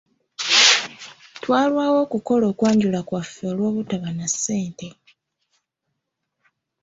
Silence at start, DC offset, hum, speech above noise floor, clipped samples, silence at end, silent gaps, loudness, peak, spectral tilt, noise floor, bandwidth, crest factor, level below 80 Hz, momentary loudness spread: 0.4 s; under 0.1%; none; 57 dB; under 0.1%; 1.9 s; none; -19 LUFS; -2 dBFS; -3 dB/octave; -78 dBFS; 8.2 kHz; 22 dB; -62 dBFS; 21 LU